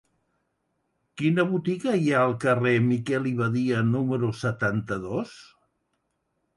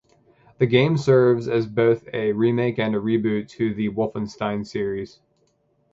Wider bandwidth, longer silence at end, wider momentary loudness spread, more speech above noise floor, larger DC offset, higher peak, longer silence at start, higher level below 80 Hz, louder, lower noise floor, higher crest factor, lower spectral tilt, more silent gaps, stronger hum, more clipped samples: first, 11.5 kHz vs 7.8 kHz; first, 1.15 s vs 0.85 s; about the same, 8 LU vs 10 LU; first, 51 dB vs 45 dB; neither; second, -10 dBFS vs -2 dBFS; first, 1.15 s vs 0.6 s; about the same, -60 dBFS vs -58 dBFS; second, -25 LUFS vs -22 LUFS; first, -76 dBFS vs -65 dBFS; about the same, 16 dB vs 20 dB; about the same, -7.5 dB/octave vs -7.5 dB/octave; neither; neither; neither